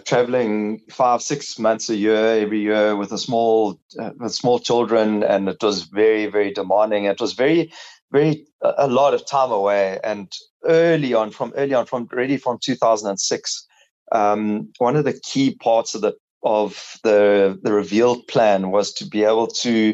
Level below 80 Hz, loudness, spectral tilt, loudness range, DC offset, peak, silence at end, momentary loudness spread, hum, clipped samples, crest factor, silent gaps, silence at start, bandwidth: -68 dBFS; -19 LUFS; -4.5 dB/octave; 2 LU; under 0.1%; -6 dBFS; 0 s; 8 LU; none; under 0.1%; 12 dB; 3.82-3.89 s, 8.02-8.08 s, 8.53-8.59 s, 10.50-10.60 s, 13.91-14.06 s, 16.20-16.41 s; 0.05 s; 8.2 kHz